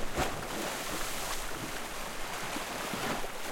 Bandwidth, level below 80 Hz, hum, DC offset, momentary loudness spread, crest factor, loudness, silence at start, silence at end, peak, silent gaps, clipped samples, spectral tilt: 16.5 kHz; -46 dBFS; none; under 0.1%; 4 LU; 18 dB; -36 LUFS; 0 s; 0 s; -18 dBFS; none; under 0.1%; -2.5 dB/octave